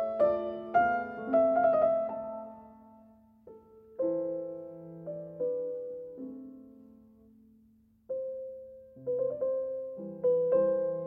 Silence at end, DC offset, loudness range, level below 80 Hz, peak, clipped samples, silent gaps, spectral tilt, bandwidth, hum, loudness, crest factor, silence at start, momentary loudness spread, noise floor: 0 s; under 0.1%; 11 LU; -70 dBFS; -14 dBFS; under 0.1%; none; -9 dB/octave; 3.8 kHz; none; -31 LUFS; 18 dB; 0 s; 19 LU; -64 dBFS